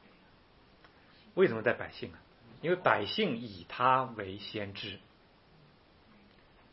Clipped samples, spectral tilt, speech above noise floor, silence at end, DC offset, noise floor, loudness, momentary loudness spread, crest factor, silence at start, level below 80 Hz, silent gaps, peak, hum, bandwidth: under 0.1%; -3 dB/octave; 30 dB; 1.75 s; under 0.1%; -62 dBFS; -32 LUFS; 15 LU; 26 dB; 1.35 s; -70 dBFS; none; -10 dBFS; none; 5.8 kHz